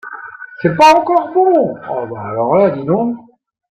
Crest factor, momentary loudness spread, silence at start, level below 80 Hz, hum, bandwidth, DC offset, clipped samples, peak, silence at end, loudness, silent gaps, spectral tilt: 14 dB; 20 LU; 0.05 s; -54 dBFS; none; 14 kHz; under 0.1%; under 0.1%; 0 dBFS; 0.5 s; -13 LUFS; none; -6 dB/octave